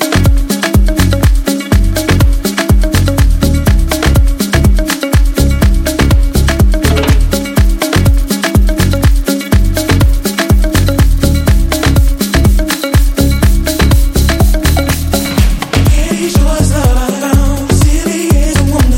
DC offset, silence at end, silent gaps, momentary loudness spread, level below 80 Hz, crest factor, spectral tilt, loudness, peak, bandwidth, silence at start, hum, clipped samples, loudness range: under 0.1%; 0 s; none; 2 LU; -12 dBFS; 8 dB; -5.5 dB/octave; -11 LUFS; 0 dBFS; 17 kHz; 0 s; none; 0.1%; 1 LU